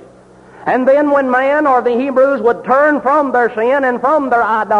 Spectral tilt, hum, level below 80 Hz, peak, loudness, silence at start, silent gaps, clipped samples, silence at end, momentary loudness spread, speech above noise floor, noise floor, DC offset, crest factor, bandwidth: -6.5 dB/octave; none; -54 dBFS; -2 dBFS; -13 LUFS; 0 s; none; under 0.1%; 0 s; 3 LU; 29 dB; -41 dBFS; under 0.1%; 10 dB; 8.8 kHz